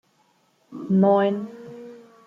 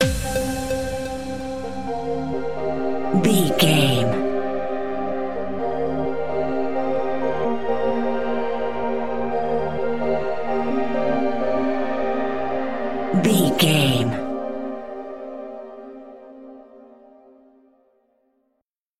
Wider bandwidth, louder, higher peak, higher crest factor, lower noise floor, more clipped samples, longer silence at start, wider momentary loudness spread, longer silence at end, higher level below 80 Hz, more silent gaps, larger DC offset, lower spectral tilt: second, 4 kHz vs 16 kHz; about the same, -21 LUFS vs -23 LUFS; second, -8 dBFS vs -2 dBFS; about the same, 18 dB vs 20 dB; second, -64 dBFS vs -75 dBFS; neither; first, 0.7 s vs 0 s; first, 24 LU vs 16 LU; first, 0.3 s vs 0 s; second, -70 dBFS vs -44 dBFS; second, none vs 18.64-18.90 s; second, under 0.1% vs 3%; first, -9.5 dB/octave vs -5 dB/octave